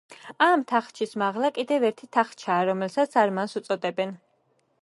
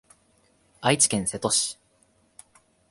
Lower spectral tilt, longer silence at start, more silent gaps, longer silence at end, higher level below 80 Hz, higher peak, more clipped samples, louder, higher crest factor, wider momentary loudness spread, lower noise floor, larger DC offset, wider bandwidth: first, -5 dB/octave vs -2.5 dB/octave; second, 0.1 s vs 0.8 s; neither; second, 0.65 s vs 1.15 s; second, -80 dBFS vs -60 dBFS; about the same, -6 dBFS vs -6 dBFS; neither; about the same, -25 LUFS vs -23 LUFS; about the same, 20 dB vs 22 dB; about the same, 9 LU vs 10 LU; first, -68 dBFS vs -64 dBFS; neither; about the same, 11.5 kHz vs 12 kHz